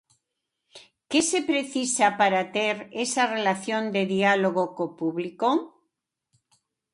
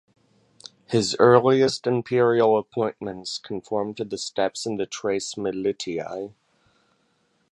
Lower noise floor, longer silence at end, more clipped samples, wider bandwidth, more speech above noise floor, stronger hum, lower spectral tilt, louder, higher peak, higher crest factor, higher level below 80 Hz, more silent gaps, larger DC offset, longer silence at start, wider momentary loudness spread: first, -82 dBFS vs -67 dBFS; about the same, 1.25 s vs 1.25 s; neither; about the same, 11.5 kHz vs 11.5 kHz; first, 57 dB vs 45 dB; neither; second, -3.5 dB/octave vs -5 dB/octave; about the same, -24 LUFS vs -23 LUFS; second, -8 dBFS vs 0 dBFS; about the same, 20 dB vs 24 dB; second, -72 dBFS vs -64 dBFS; neither; neither; second, 0.75 s vs 0.9 s; second, 8 LU vs 14 LU